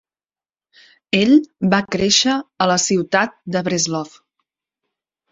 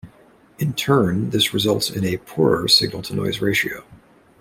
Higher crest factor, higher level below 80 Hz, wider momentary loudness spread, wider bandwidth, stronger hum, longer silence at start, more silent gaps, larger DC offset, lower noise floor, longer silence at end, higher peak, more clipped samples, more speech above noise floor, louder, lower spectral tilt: about the same, 18 dB vs 18 dB; about the same, -54 dBFS vs -52 dBFS; about the same, 8 LU vs 10 LU; second, 8 kHz vs 16.5 kHz; neither; first, 1.15 s vs 0.05 s; neither; neither; first, under -90 dBFS vs -51 dBFS; first, 1.25 s vs 0.45 s; about the same, -2 dBFS vs -2 dBFS; neither; first, over 73 dB vs 32 dB; about the same, -17 LUFS vs -19 LUFS; about the same, -3.5 dB/octave vs -4.5 dB/octave